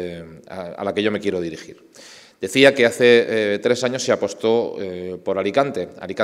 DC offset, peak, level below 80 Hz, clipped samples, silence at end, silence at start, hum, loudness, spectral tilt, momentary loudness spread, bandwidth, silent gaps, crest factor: under 0.1%; 0 dBFS; -62 dBFS; under 0.1%; 0 s; 0 s; none; -19 LUFS; -4 dB/octave; 18 LU; 14.5 kHz; none; 20 dB